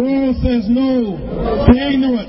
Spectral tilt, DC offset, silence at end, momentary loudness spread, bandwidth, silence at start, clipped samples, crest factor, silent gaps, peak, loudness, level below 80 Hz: -12 dB/octave; under 0.1%; 0 s; 8 LU; 5.8 kHz; 0 s; under 0.1%; 14 dB; none; 0 dBFS; -15 LUFS; -24 dBFS